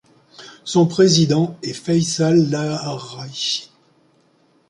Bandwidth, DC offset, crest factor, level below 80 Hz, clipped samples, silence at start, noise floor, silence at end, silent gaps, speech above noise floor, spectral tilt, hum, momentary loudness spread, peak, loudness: 11 kHz; under 0.1%; 18 dB; -60 dBFS; under 0.1%; 0.4 s; -58 dBFS; 1.05 s; none; 41 dB; -5 dB/octave; none; 14 LU; -2 dBFS; -18 LUFS